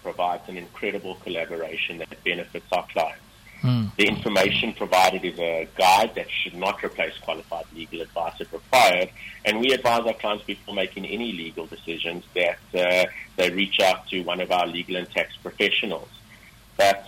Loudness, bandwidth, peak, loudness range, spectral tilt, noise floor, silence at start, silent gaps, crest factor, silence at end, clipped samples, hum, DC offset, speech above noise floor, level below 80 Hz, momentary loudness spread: -24 LUFS; 17 kHz; -2 dBFS; 5 LU; -4 dB/octave; -49 dBFS; 0.05 s; none; 22 dB; 0 s; under 0.1%; none; under 0.1%; 25 dB; -56 dBFS; 13 LU